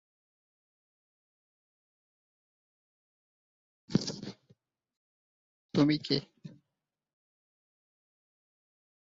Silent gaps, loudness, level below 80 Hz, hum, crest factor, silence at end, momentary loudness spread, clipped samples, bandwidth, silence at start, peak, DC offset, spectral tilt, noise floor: 4.97-5.69 s; -31 LUFS; -72 dBFS; none; 26 dB; 2.65 s; 24 LU; under 0.1%; 7.4 kHz; 3.9 s; -12 dBFS; under 0.1%; -5.5 dB/octave; -88 dBFS